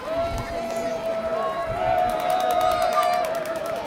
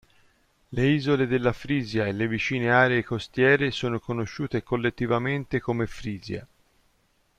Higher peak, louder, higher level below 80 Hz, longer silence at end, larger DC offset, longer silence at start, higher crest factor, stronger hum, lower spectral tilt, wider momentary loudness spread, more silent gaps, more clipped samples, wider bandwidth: second, -10 dBFS vs -6 dBFS; about the same, -24 LUFS vs -25 LUFS; first, -44 dBFS vs -52 dBFS; second, 0 s vs 0.95 s; neither; second, 0 s vs 0.7 s; second, 14 dB vs 20 dB; neither; second, -4 dB/octave vs -6.5 dB/octave; second, 7 LU vs 11 LU; neither; neither; first, 17 kHz vs 10.5 kHz